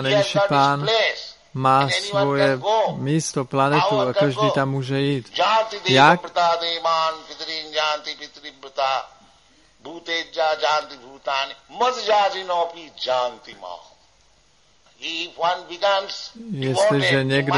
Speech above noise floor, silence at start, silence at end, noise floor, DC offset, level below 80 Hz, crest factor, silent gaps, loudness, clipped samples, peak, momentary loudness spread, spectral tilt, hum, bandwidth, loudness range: 38 dB; 0 s; 0 s; -59 dBFS; under 0.1%; -62 dBFS; 22 dB; none; -20 LUFS; under 0.1%; 0 dBFS; 14 LU; -4.5 dB/octave; none; 11.5 kHz; 8 LU